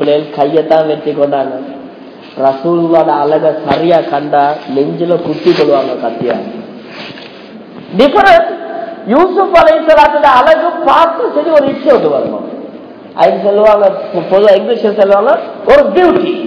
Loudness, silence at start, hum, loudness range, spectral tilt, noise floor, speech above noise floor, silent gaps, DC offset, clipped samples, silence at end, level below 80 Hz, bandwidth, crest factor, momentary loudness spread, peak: -9 LUFS; 0 s; none; 5 LU; -7 dB/octave; -31 dBFS; 22 dB; none; under 0.1%; 3%; 0 s; -44 dBFS; 5.4 kHz; 10 dB; 18 LU; 0 dBFS